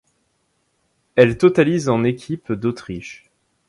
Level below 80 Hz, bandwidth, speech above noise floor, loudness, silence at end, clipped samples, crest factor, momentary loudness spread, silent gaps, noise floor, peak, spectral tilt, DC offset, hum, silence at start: -52 dBFS; 11.5 kHz; 50 dB; -18 LUFS; 0.55 s; under 0.1%; 20 dB; 18 LU; none; -67 dBFS; 0 dBFS; -7 dB/octave; under 0.1%; none; 1.15 s